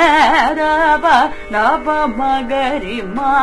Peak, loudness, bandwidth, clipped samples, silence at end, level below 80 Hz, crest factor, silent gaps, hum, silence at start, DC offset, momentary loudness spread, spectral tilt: 0 dBFS; -14 LUFS; 11 kHz; under 0.1%; 0 s; -36 dBFS; 14 dB; none; none; 0 s; under 0.1%; 8 LU; -4 dB/octave